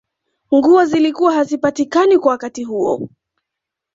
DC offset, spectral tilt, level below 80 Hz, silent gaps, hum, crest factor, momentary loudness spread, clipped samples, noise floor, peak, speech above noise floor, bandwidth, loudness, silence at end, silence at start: under 0.1%; -5.5 dB/octave; -60 dBFS; none; none; 14 dB; 11 LU; under 0.1%; -82 dBFS; -2 dBFS; 68 dB; 7.8 kHz; -15 LUFS; 0.85 s; 0.5 s